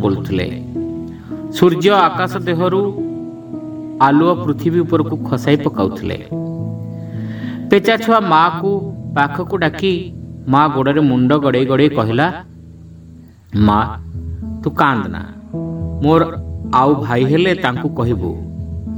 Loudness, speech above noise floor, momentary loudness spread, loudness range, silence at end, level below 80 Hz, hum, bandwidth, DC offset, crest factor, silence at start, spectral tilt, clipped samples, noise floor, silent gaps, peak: -16 LUFS; 25 dB; 14 LU; 3 LU; 0 s; -38 dBFS; none; 19 kHz; under 0.1%; 16 dB; 0 s; -7.5 dB/octave; under 0.1%; -39 dBFS; none; 0 dBFS